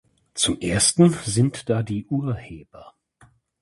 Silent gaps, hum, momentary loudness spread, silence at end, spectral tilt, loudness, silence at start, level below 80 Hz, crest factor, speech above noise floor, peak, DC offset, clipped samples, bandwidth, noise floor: none; none; 17 LU; 0.7 s; -4.5 dB/octave; -21 LUFS; 0.35 s; -48 dBFS; 20 dB; 35 dB; -4 dBFS; under 0.1%; under 0.1%; 11.5 kHz; -57 dBFS